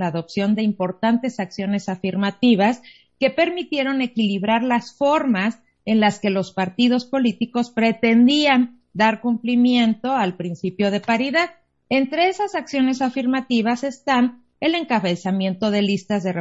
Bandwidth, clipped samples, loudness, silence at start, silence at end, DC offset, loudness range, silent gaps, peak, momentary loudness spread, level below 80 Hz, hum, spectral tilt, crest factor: 8 kHz; under 0.1%; -20 LUFS; 0 s; 0 s; under 0.1%; 3 LU; none; -4 dBFS; 8 LU; -62 dBFS; none; -6 dB/octave; 16 dB